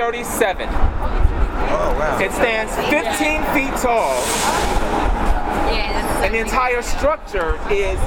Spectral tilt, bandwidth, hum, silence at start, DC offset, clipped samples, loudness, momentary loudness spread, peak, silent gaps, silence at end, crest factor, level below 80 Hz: -4 dB/octave; 19 kHz; none; 0 s; under 0.1%; under 0.1%; -19 LUFS; 4 LU; -2 dBFS; none; 0 s; 16 dB; -22 dBFS